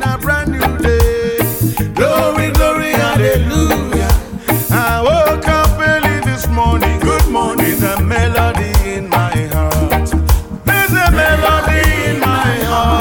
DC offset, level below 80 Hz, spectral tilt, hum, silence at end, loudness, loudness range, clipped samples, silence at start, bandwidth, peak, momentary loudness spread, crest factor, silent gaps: under 0.1%; -20 dBFS; -5.5 dB/octave; none; 0 s; -13 LUFS; 1 LU; under 0.1%; 0 s; 17.5 kHz; 0 dBFS; 4 LU; 12 dB; none